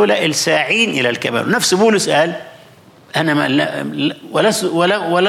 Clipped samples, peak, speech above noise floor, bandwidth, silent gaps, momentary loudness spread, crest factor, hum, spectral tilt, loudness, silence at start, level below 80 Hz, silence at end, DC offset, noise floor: under 0.1%; -4 dBFS; 29 dB; 16.5 kHz; none; 7 LU; 12 dB; none; -3.5 dB/octave; -15 LUFS; 0 s; -62 dBFS; 0 s; under 0.1%; -44 dBFS